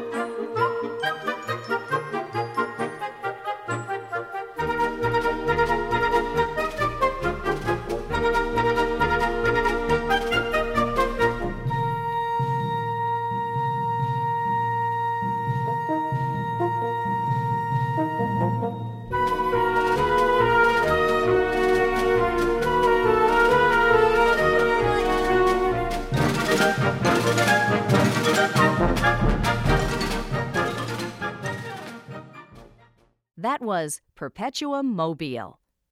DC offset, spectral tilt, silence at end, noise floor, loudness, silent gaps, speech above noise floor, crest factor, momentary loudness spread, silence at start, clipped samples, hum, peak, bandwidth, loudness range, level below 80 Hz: under 0.1%; -5.5 dB/octave; 0.4 s; -60 dBFS; -23 LUFS; none; 32 dB; 18 dB; 11 LU; 0 s; under 0.1%; none; -6 dBFS; 16.5 kHz; 9 LU; -38 dBFS